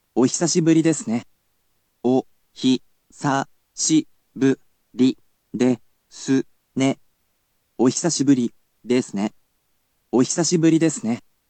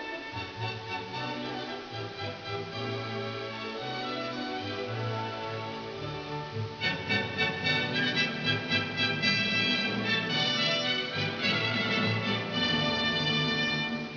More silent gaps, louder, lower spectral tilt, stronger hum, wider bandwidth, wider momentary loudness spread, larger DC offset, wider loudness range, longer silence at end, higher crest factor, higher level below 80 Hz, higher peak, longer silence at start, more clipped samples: neither; first, -21 LUFS vs -29 LUFS; about the same, -4.5 dB/octave vs -4.5 dB/octave; neither; first, 9.2 kHz vs 5.4 kHz; about the same, 11 LU vs 11 LU; neither; second, 3 LU vs 9 LU; first, 0.3 s vs 0 s; about the same, 16 dB vs 16 dB; second, -70 dBFS vs -62 dBFS; first, -6 dBFS vs -14 dBFS; first, 0.15 s vs 0 s; neither